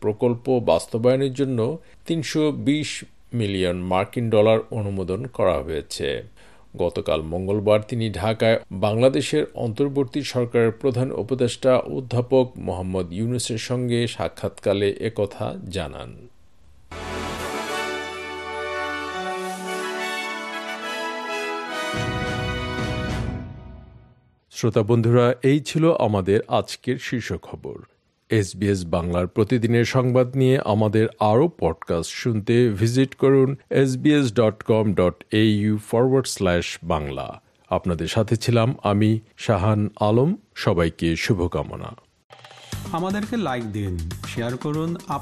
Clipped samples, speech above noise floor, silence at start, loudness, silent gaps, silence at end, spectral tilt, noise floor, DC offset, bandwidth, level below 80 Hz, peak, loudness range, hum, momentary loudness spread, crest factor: under 0.1%; 34 dB; 0 s; -22 LUFS; 42.24-42.30 s; 0 s; -6 dB/octave; -56 dBFS; under 0.1%; 13 kHz; -48 dBFS; -4 dBFS; 8 LU; none; 11 LU; 18 dB